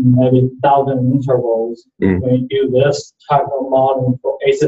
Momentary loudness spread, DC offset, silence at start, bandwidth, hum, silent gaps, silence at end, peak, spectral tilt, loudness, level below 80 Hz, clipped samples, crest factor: 5 LU; under 0.1%; 0 s; 8 kHz; none; none; 0 s; 0 dBFS; -7.5 dB/octave; -15 LUFS; -42 dBFS; under 0.1%; 14 dB